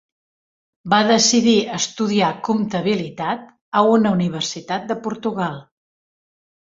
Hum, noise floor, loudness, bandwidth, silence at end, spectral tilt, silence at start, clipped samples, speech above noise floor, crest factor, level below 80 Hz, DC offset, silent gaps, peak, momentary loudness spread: none; under -90 dBFS; -19 LUFS; 7.8 kHz; 1.05 s; -4 dB/octave; 0.85 s; under 0.1%; over 72 dB; 18 dB; -60 dBFS; under 0.1%; 3.61-3.72 s; -2 dBFS; 12 LU